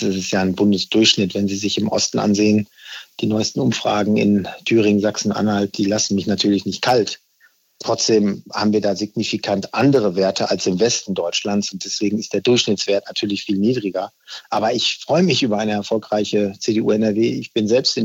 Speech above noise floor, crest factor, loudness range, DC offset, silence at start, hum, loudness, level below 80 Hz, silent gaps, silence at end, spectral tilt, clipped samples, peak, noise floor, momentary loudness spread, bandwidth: 39 dB; 16 dB; 2 LU; under 0.1%; 0 s; none; -18 LUFS; -60 dBFS; none; 0 s; -4.5 dB/octave; under 0.1%; -2 dBFS; -57 dBFS; 6 LU; 16 kHz